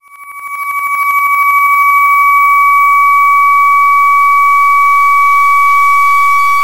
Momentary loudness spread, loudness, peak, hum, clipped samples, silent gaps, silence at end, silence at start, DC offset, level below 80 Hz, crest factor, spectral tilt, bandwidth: 6 LU; -7 LUFS; 0 dBFS; none; under 0.1%; none; 0 s; 0 s; under 0.1%; -58 dBFS; 8 dB; 1 dB/octave; 16 kHz